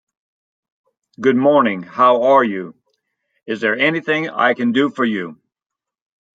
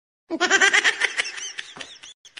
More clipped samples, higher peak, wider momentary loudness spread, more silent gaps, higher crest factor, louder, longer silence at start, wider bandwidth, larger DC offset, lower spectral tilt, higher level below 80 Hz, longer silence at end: neither; about the same, -2 dBFS vs -4 dBFS; second, 13 LU vs 22 LU; second, none vs 2.14-2.24 s; about the same, 16 dB vs 20 dB; first, -16 LUFS vs -19 LUFS; first, 1.2 s vs 0.3 s; second, 7.8 kHz vs 10.5 kHz; neither; first, -6.5 dB/octave vs 1 dB/octave; about the same, -70 dBFS vs -72 dBFS; first, 1 s vs 0.1 s